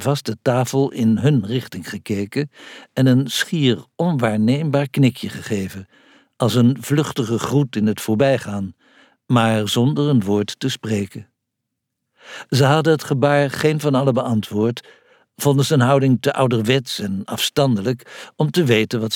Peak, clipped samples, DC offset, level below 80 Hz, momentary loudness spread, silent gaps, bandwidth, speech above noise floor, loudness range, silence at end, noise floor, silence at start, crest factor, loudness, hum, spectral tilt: -2 dBFS; under 0.1%; under 0.1%; -62 dBFS; 12 LU; none; 17.5 kHz; 60 dB; 2 LU; 0 s; -78 dBFS; 0 s; 16 dB; -19 LUFS; none; -6 dB/octave